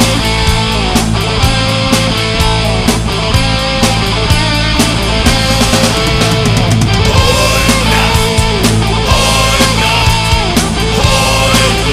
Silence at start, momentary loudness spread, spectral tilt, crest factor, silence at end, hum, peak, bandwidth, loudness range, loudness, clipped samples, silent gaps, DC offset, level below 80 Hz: 0 s; 3 LU; -4 dB/octave; 10 dB; 0 s; none; 0 dBFS; 16 kHz; 2 LU; -10 LUFS; 0.2%; none; under 0.1%; -18 dBFS